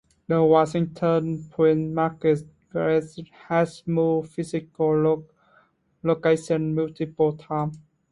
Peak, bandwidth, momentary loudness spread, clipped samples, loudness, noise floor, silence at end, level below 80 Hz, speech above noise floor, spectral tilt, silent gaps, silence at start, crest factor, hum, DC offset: -6 dBFS; 11 kHz; 9 LU; under 0.1%; -24 LUFS; -61 dBFS; 0.35 s; -60 dBFS; 39 dB; -8 dB/octave; none; 0.3 s; 18 dB; none; under 0.1%